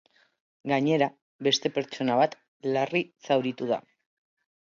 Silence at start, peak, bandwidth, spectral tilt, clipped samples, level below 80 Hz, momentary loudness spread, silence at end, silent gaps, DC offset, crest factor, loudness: 0.65 s; -8 dBFS; 7.6 kHz; -4.5 dB/octave; under 0.1%; -76 dBFS; 6 LU; 0.85 s; 1.22-1.39 s, 2.48-2.60 s; under 0.1%; 20 dB; -27 LUFS